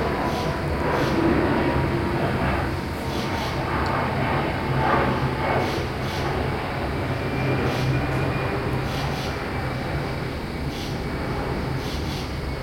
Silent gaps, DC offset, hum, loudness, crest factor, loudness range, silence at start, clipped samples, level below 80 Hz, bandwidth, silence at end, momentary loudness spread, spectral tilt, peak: none; under 0.1%; none; -25 LUFS; 16 dB; 4 LU; 0 s; under 0.1%; -36 dBFS; 16.5 kHz; 0 s; 7 LU; -6.5 dB/octave; -8 dBFS